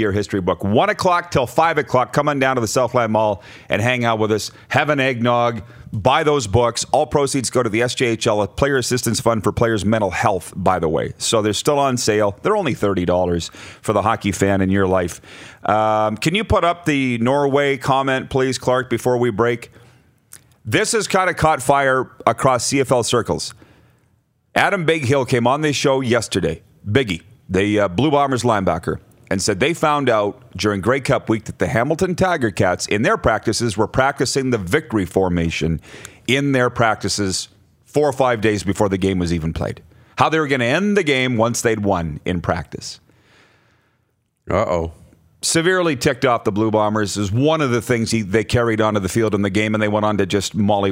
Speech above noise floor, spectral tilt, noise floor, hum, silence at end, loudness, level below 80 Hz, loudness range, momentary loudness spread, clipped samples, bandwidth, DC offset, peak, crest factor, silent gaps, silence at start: 49 dB; -5 dB/octave; -66 dBFS; none; 0 s; -18 LUFS; -46 dBFS; 2 LU; 7 LU; under 0.1%; 16 kHz; under 0.1%; 0 dBFS; 18 dB; none; 0 s